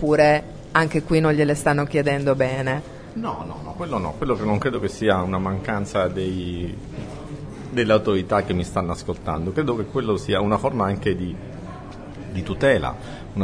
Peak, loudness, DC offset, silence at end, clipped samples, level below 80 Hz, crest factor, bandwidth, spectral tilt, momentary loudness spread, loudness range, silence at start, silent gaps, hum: -2 dBFS; -22 LUFS; under 0.1%; 0 s; under 0.1%; -42 dBFS; 22 dB; 11 kHz; -6.5 dB/octave; 15 LU; 3 LU; 0 s; none; none